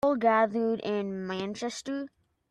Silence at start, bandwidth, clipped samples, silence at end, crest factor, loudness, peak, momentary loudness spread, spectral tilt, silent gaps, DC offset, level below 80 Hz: 0.05 s; 12 kHz; under 0.1%; 0.45 s; 18 dB; -29 LUFS; -12 dBFS; 12 LU; -5 dB/octave; none; under 0.1%; -70 dBFS